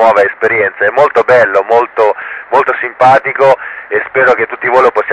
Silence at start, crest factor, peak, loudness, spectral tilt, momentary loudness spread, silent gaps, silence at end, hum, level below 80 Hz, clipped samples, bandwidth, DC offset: 0 s; 10 dB; 0 dBFS; -10 LUFS; -5.5 dB/octave; 6 LU; none; 0 s; none; -52 dBFS; 0.5%; 9.4 kHz; under 0.1%